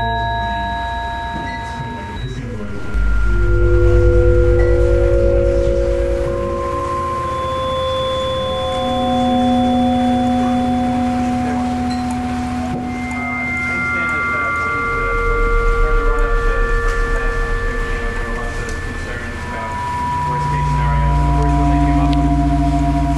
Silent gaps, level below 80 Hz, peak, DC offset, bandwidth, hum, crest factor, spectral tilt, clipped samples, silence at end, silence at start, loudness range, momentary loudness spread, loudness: none; -20 dBFS; -2 dBFS; under 0.1%; 12 kHz; none; 14 dB; -7 dB/octave; under 0.1%; 0 s; 0 s; 6 LU; 9 LU; -18 LUFS